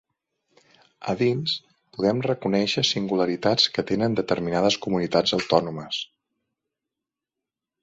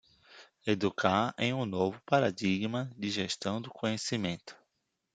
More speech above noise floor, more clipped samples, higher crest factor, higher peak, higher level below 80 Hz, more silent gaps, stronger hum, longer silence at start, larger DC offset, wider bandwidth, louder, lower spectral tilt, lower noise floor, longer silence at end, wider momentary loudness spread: first, 64 dB vs 50 dB; neither; about the same, 22 dB vs 24 dB; first, -4 dBFS vs -10 dBFS; first, -60 dBFS vs -72 dBFS; neither; neither; first, 1 s vs 0.3 s; neither; second, 8 kHz vs 9.4 kHz; first, -23 LUFS vs -32 LUFS; about the same, -5 dB/octave vs -5 dB/octave; first, -87 dBFS vs -82 dBFS; first, 1.8 s vs 0.6 s; about the same, 10 LU vs 8 LU